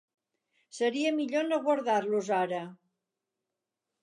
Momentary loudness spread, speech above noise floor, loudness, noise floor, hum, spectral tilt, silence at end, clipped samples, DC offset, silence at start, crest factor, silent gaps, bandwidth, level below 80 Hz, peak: 9 LU; 59 dB; -30 LUFS; -88 dBFS; none; -4.5 dB/octave; 1.3 s; under 0.1%; under 0.1%; 0.75 s; 16 dB; none; 11 kHz; -86 dBFS; -16 dBFS